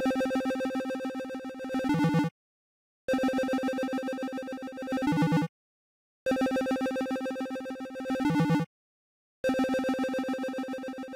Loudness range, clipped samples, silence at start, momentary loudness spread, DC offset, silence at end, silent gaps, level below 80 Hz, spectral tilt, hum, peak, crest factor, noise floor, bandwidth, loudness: 1 LU; under 0.1%; 0 s; 10 LU; under 0.1%; 0 s; 2.31-3.08 s, 5.49-6.26 s, 8.66-9.44 s; -62 dBFS; -6.5 dB/octave; none; -20 dBFS; 10 dB; under -90 dBFS; 16 kHz; -31 LUFS